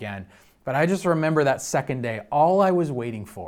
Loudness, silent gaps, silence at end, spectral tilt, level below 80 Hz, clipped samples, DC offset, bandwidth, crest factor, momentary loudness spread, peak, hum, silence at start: -23 LUFS; none; 0 s; -6 dB/octave; -60 dBFS; under 0.1%; under 0.1%; 16.5 kHz; 16 dB; 14 LU; -8 dBFS; none; 0 s